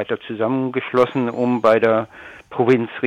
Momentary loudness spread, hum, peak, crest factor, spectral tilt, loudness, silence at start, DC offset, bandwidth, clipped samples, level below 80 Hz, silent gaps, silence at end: 12 LU; none; -4 dBFS; 16 dB; -7.5 dB/octave; -19 LUFS; 0 s; under 0.1%; 9.2 kHz; under 0.1%; -62 dBFS; none; 0 s